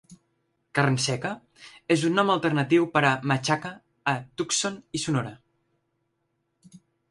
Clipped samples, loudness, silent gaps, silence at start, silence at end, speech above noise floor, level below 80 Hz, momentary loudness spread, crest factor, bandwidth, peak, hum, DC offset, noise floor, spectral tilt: under 0.1%; -25 LUFS; none; 0.1 s; 0.35 s; 51 dB; -66 dBFS; 10 LU; 20 dB; 11.5 kHz; -8 dBFS; none; under 0.1%; -76 dBFS; -4.5 dB/octave